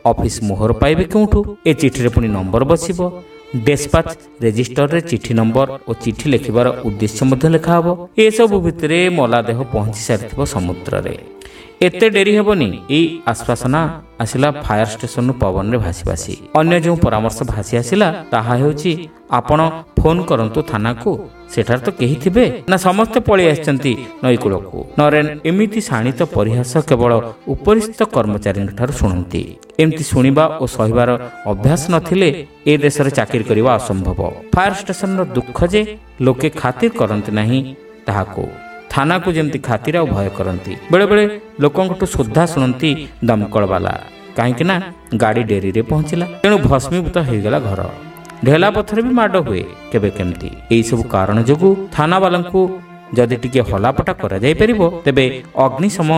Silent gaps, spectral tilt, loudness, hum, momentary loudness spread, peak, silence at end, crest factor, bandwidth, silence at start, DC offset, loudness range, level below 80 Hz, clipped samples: none; -6 dB/octave; -15 LUFS; none; 8 LU; 0 dBFS; 0 s; 14 dB; 16 kHz; 0.05 s; under 0.1%; 3 LU; -32 dBFS; under 0.1%